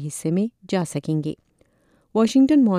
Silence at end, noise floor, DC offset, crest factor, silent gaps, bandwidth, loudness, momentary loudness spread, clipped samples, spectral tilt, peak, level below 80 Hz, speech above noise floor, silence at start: 0 s; -62 dBFS; under 0.1%; 12 dB; none; 13 kHz; -22 LUFS; 12 LU; under 0.1%; -6.5 dB/octave; -8 dBFS; -62 dBFS; 42 dB; 0 s